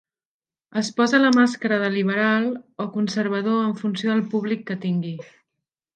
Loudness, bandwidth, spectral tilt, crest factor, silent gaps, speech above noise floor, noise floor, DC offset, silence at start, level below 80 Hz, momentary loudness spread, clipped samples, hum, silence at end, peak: -22 LUFS; 9.2 kHz; -5.5 dB/octave; 18 dB; none; 61 dB; -83 dBFS; under 0.1%; 0.75 s; -74 dBFS; 11 LU; under 0.1%; none; 0.7 s; -6 dBFS